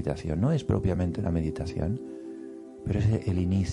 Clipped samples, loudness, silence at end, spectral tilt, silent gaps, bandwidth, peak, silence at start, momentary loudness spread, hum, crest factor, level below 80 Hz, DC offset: under 0.1%; -28 LUFS; 0 s; -8.5 dB/octave; none; 11 kHz; -12 dBFS; 0 s; 14 LU; none; 16 dB; -46 dBFS; under 0.1%